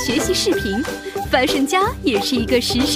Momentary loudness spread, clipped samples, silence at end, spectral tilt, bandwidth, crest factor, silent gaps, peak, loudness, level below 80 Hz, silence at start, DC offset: 6 LU; under 0.1%; 0 s; -3.5 dB/octave; 16 kHz; 16 dB; none; -2 dBFS; -18 LUFS; -36 dBFS; 0 s; under 0.1%